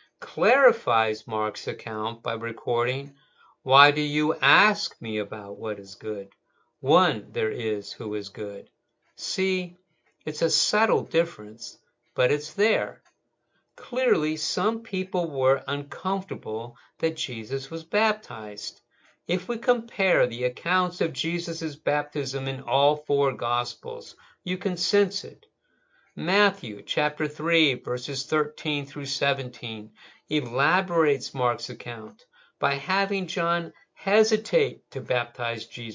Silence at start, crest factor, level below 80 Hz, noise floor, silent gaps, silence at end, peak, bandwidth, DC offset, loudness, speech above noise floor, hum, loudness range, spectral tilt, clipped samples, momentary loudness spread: 0.2 s; 24 dB; -74 dBFS; -73 dBFS; none; 0 s; -2 dBFS; 7.6 kHz; under 0.1%; -25 LUFS; 47 dB; none; 5 LU; -4 dB/octave; under 0.1%; 14 LU